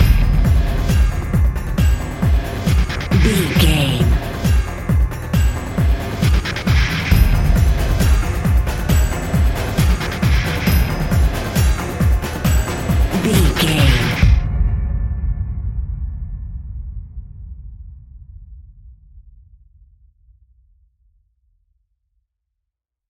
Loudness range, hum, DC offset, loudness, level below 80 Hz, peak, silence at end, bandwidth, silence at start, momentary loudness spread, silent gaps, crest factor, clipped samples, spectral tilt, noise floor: 12 LU; none; under 0.1%; -17 LUFS; -20 dBFS; 0 dBFS; 3.9 s; 17 kHz; 0 s; 12 LU; none; 16 dB; under 0.1%; -5.5 dB/octave; -80 dBFS